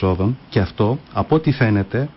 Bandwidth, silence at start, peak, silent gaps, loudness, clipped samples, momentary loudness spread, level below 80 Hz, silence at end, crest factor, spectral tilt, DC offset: 5.8 kHz; 0 s; -6 dBFS; none; -19 LUFS; under 0.1%; 4 LU; -36 dBFS; 0.05 s; 12 dB; -12.5 dB/octave; under 0.1%